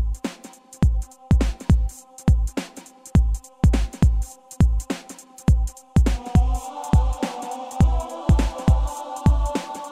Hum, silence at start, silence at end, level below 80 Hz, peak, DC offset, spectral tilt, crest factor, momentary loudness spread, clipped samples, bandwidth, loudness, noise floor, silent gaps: none; 0 s; 0 s; -22 dBFS; -2 dBFS; under 0.1%; -7 dB/octave; 18 dB; 11 LU; under 0.1%; 13.5 kHz; -23 LUFS; -44 dBFS; none